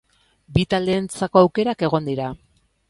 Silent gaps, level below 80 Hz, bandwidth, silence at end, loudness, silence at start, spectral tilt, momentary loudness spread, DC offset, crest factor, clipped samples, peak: none; -46 dBFS; 11.5 kHz; 0.55 s; -20 LUFS; 0.5 s; -6.5 dB/octave; 11 LU; under 0.1%; 20 dB; under 0.1%; 0 dBFS